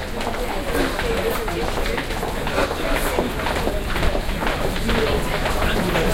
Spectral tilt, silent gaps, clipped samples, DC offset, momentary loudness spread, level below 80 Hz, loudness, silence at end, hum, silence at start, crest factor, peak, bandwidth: -4.5 dB/octave; none; under 0.1%; under 0.1%; 4 LU; -26 dBFS; -23 LUFS; 0 s; none; 0 s; 18 dB; -2 dBFS; 16.5 kHz